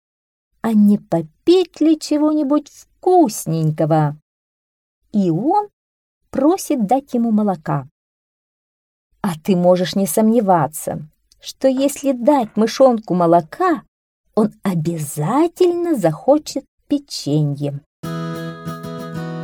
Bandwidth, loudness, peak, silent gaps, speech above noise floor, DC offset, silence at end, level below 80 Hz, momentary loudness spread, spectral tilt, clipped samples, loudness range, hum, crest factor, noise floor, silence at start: 18 kHz; -18 LUFS; -2 dBFS; 4.22-5.02 s, 5.73-6.21 s, 7.91-9.10 s, 13.88-14.24 s, 16.68-16.78 s, 17.86-18.03 s; over 74 dB; under 0.1%; 0 s; -58 dBFS; 13 LU; -6.5 dB/octave; under 0.1%; 4 LU; none; 16 dB; under -90 dBFS; 0.65 s